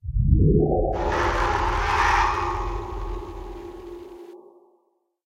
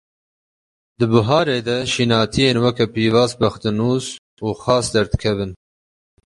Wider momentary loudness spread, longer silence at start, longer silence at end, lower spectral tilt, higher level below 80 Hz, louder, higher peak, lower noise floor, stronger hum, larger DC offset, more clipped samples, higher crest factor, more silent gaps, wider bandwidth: first, 20 LU vs 9 LU; second, 0.05 s vs 1 s; first, 0.9 s vs 0.75 s; about the same, -6.5 dB/octave vs -5.5 dB/octave; first, -28 dBFS vs -40 dBFS; second, -23 LUFS vs -18 LUFS; second, -6 dBFS vs -2 dBFS; second, -68 dBFS vs under -90 dBFS; neither; neither; neither; about the same, 18 dB vs 18 dB; second, none vs 4.18-4.37 s; about the same, 10.5 kHz vs 11.5 kHz